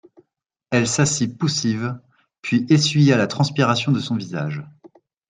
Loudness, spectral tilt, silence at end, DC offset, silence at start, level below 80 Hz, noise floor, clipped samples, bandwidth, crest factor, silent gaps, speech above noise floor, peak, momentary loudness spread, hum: -20 LUFS; -5 dB/octave; 0.45 s; under 0.1%; 0.7 s; -60 dBFS; -75 dBFS; under 0.1%; 9.6 kHz; 18 dB; none; 56 dB; -4 dBFS; 12 LU; none